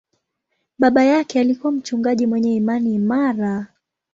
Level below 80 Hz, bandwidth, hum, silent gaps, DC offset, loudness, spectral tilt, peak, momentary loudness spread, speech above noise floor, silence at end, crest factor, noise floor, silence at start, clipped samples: -62 dBFS; 7.6 kHz; none; none; under 0.1%; -18 LUFS; -6.5 dB/octave; -2 dBFS; 8 LU; 56 dB; 0.5 s; 16 dB; -74 dBFS; 0.8 s; under 0.1%